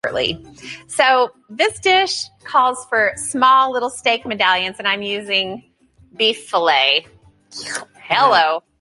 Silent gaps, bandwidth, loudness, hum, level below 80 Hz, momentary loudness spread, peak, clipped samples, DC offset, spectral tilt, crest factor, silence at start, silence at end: none; 11.5 kHz; -17 LUFS; none; -56 dBFS; 14 LU; -2 dBFS; under 0.1%; under 0.1%; -1.5 dB/octave; 16 dB; 0.05 s; 0.2 s